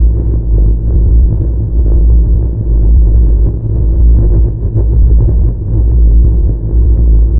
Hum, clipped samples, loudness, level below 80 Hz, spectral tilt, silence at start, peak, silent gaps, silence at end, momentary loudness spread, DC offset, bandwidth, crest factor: none; under 0.1%; -11 LUFS; -8 dBFS; -16.5 dB/octave; 0 s; 0 dBFS; none; 0 s; 4 LU; under 0.1%; 1.1 kHz; 8 dB